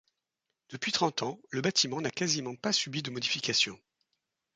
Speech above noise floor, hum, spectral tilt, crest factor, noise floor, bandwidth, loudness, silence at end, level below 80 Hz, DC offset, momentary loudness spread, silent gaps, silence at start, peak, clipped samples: 54 dB; none; -2.5 dB/octave; 22 dB; -86 dBFS; 11 kHz; -30 LUFS; 0.8 s; -74 dBFS; under 0.1%; 8 LU; none; 0.7 s; -12 dBFS; under 0.1%